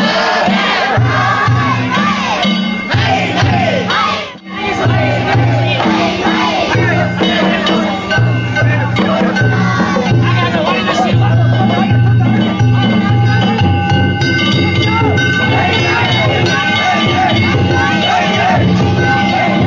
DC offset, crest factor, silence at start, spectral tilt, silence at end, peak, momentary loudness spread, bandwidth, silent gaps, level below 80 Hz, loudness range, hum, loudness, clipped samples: under 0.1%; 10 dB; 0 s; -6 dB/octave; 0 s; -2 dBFS; 2 LU; 7.6 kHz; none; -32 dBFS; 2 LU; none; -12 LUFS; under 0.1%